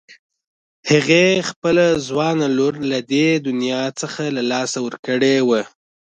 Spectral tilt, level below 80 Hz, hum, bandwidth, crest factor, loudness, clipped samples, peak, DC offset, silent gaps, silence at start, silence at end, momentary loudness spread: -4.5 dB/octave; -58 dBFS; none; 9.6 kHz; 16 dB; -18 LUFS; under 0.1%; -2 dBFS; under 0.1%; 0.19-0.30 s, 0.47-0.83 s, 1.56-1.62 s, 4.99-5.03 s; 0.1 s; 0.45 s; 9 LU